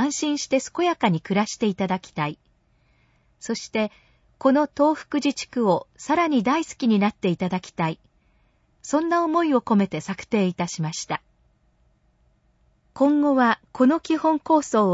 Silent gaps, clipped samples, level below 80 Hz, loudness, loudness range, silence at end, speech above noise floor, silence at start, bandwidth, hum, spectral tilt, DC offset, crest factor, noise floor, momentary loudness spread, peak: none; under 0.1%; -62 dBFS; -23 LUFS; 5 LU; 0 s; 41 dB; 0 s; 8 kHz; none; -5.5 dB/octave; under 0.1%; 16 dB; -63 dBFS; 9 LU; -6 dBFS